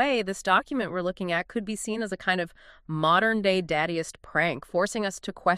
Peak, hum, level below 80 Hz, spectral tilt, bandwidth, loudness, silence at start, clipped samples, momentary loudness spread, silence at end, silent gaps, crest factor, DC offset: -8 dBFS; none; -58 dBFS; -4.5 dB/octave; 14.5 kHz; -27 LUFS; 0 s; under 0.1%; 9 LU; 0 s; none; 20 dB; under 0.1%